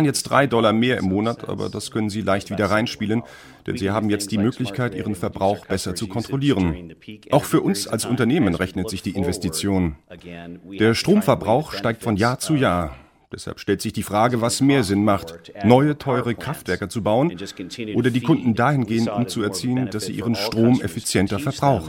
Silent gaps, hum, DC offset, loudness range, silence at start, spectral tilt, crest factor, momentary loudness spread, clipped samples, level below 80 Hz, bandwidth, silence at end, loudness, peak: none; none; under 0.1%; 3 LU; 0 s; -5.5 dB/octave; 20 dB; 10 LU; under 0.1%; -48 dBFS; 17 kHz; 0 s; -21 LUFS; 0 dBFS